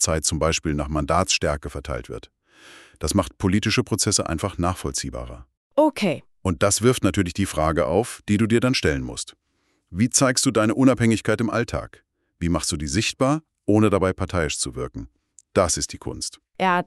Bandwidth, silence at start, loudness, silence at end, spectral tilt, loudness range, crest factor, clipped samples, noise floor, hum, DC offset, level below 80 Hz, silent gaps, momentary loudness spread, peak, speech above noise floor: 13.5 kHz; 0 s; -22 LUFS; 0.05 s; -4.5 dB/octave; 3 LU; 20 dB; under 0.1%; -69 dBFS; none; under 0.1%; -40 dBFS; 5.57-5.70 s; 13 LU; -4 dBFS; 47 dB